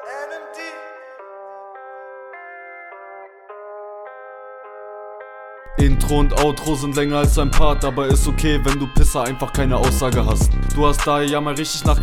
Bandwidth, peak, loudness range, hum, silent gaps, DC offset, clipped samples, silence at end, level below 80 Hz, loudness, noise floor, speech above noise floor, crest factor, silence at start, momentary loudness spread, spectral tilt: 16 kHz; 0 dBFS; 18 LU; none; none; under 0.1%; under 0.1%; 0 s; -22 dBFS; -19 LUFS; -39 dBFS; 23 dB; 18 dB; 0 s; 19 LU; -5 dB/octave